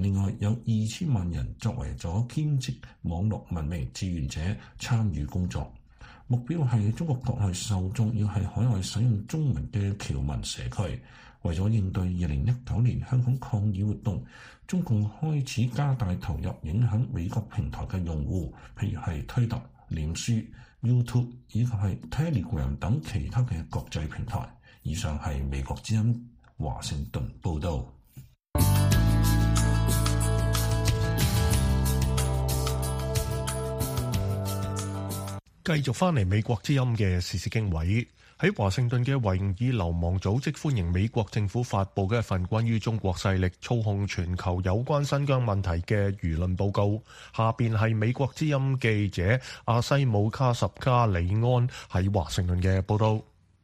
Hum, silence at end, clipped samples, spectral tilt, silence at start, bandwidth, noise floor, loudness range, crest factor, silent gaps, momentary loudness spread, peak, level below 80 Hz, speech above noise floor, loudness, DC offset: none; 0.4 s; under 0.1%; -6 dB/octave; 0 s; 15.5 kHz; -51 dBFS; 6 LU; 18 dB; none; 8 LU; -8 dBFS; -38 dBFS; 24 dB; -28 LUFS; under 0.1%